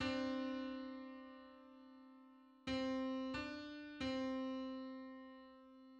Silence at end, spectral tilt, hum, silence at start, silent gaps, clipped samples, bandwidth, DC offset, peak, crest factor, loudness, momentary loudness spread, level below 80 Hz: 0 s; -5 dB/octave; none; 0 s; none; under 0.1%; 8.6 kHz; under 0.1%; -30 dBFS; 16 dB; -45 LUFS; 19 LU; -70 dBFS